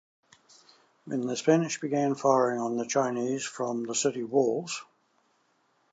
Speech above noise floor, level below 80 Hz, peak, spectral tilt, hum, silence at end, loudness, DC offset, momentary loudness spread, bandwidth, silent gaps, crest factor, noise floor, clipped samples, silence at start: 43 dB; -84 dBFS; -8 dBFS; -4.5 dB/octave; none; 1.1 s; -28 LUFS; under 0.1%; 9 LU; 9.2 kHz; none; 22 dB; -70 dBFS; under 0.1%; 1.05 s